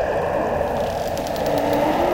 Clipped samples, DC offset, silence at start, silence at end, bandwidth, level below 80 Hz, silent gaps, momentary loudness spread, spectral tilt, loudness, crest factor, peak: under 0.1%; under 0.1%; 0 s; 0 s; 17 kHz; -40 dBFS; none; 4 LU; -5.5 dB/octave; -22 LUFS; 14 dB; -6 dBFS